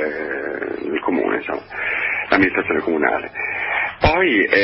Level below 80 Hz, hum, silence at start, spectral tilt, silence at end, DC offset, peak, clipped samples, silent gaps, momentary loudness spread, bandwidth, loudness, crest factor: -40 dBFS; none; 0 s; -9.5 dB/octave; 0 s; under 0.1%; 0 dBFS; under 0.1%; none; 9 LU; 5.8 kHz; -19 LUFS; 20 dB